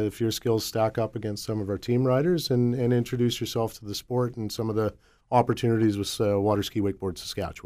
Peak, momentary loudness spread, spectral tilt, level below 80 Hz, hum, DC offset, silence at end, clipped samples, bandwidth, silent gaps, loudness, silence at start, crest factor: -6 dBFS; 7 LU; -6 dB/octave; -54 dBFS; none; under 0.1%; 0.05 s; under 0.1%; 15.5 kHz; none; -26 LUFS; 0 s; 20 dB